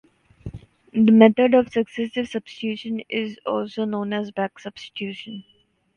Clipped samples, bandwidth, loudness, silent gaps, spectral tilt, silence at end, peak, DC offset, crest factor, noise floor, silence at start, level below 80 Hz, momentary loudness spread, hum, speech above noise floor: under 0.1%; 6.8 kHz; -21 LUFS; none; -7 dB/octave; 0.55 s; 0 dBFS; under 0.1%; 22 dB; -40 dBFS; 0.45 s; -56 dBFS; 24 LU; none; 19 dB